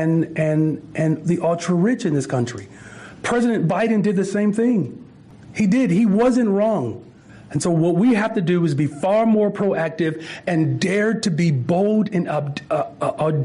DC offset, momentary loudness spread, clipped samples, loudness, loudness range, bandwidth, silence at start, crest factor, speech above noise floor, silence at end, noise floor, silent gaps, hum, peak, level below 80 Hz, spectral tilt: under 0.1%; 8 LU; under 0.1%; -20 LUFS; 2 LU; 10.5 kHz; 0 s; 10 dB; 24 dB; 0 s; -43 dBFS; none; none; -10 dBFS; -56 dBFS; -7 dB/octave